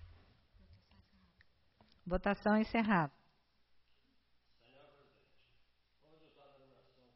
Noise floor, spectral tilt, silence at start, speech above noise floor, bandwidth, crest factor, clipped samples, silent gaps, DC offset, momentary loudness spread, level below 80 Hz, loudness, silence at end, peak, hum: -74 dBFS; -5.5 dB/octave; 0 s; 40 dB; 5.8 kHz; 22 dB; under 0.1%; none; under 0.1%; 10 LU; -58 dBFS; -35 LUFS; 4.05 s; -20 dBFS; none